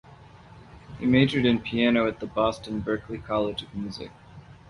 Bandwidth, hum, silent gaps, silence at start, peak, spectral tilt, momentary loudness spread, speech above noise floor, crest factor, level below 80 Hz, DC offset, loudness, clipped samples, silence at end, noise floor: 11 kHz; none; none; 0.1 s; -6 dBFS; -7 dB/octave; 14 LU; 24 dB; 20 dB; -50 dBFS; under 0.1%; -25 LUFS; under 0.1%; 0.15 s; -49 dBFS